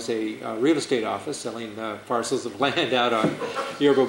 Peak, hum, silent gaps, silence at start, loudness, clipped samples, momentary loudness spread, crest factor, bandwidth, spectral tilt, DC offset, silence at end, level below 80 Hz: -8 dBFS; none; none; 0 s; -25 LUFS; under 0.1%; 10 LU; 16 dB; 16 kHz; -4 dB/octave; under 0.1%; 0 s; -66 dBFS